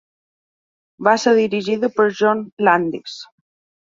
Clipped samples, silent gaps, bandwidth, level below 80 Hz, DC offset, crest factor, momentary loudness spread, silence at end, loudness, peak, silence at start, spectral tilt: under 0.1%; 2.52-2.57 s; 7.6 kHz; -66 dBFS; under 0.1%; 18 dB; 13 LU; 0.55 s; -17 LUFS; -2 dBFS; 1 s; -5 dB/octave